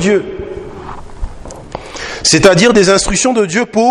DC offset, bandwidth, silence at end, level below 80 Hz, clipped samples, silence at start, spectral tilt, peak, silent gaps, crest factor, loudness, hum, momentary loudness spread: under 0.1%; 13 kHz; 0 s; -30 dBFS; 0.4%; 0 s; -3.5 dB/octave; 0 dBFS; none; 12 dB; -10 LUFS; none; 22 LU